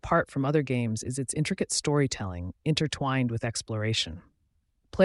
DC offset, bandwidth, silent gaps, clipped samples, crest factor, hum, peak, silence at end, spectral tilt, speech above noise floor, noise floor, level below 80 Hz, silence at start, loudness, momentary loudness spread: under 0.1%; 11.5 kHz; none; under 0.1%; 20 dB; none; -10 dBFS; 0 s; -5 dB/octave; 44 dB; -72 dBFS; -52 dBFS; 0.05 s; -28 LUFS; 8 LU